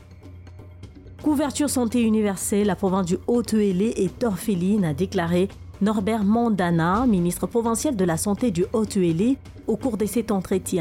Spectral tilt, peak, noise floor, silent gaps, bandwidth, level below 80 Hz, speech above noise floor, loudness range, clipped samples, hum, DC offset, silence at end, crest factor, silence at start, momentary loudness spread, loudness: -6 dB/octave; -12 dBFS; -42 dBFS; none; 16.5 kHz; -46 dBFS; 21 dB; 1 LU; under 0.1%; none; under 0.1%; 0 s; 10 dB; 0 s; 4 LU; -23 LUFS